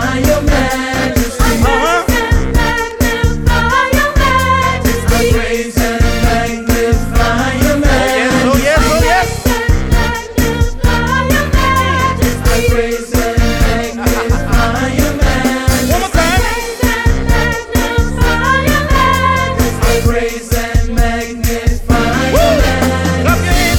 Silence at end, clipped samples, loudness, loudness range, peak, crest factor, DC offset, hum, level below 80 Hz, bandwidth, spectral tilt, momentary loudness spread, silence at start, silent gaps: 0 s; under 0.1%; -13 LUFS; 2 LU; 0 dBFS; 12 dB; under 0.1%; none; -16 dBFS; 20 kHz; -5 dB/octave; 4 LU; 0 s; none